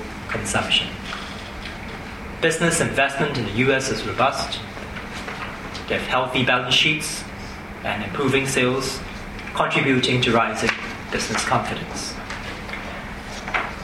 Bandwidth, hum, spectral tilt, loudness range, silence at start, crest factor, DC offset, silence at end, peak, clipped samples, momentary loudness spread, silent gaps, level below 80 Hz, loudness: 16 kHz; none; -3.5 dB/octave; 2 LU; 0 s; 18 dB; under 0.1%; 0 s; -6 dBFS; under 0.1%; 14 LU; none; -42 dBFS; -22 LUFS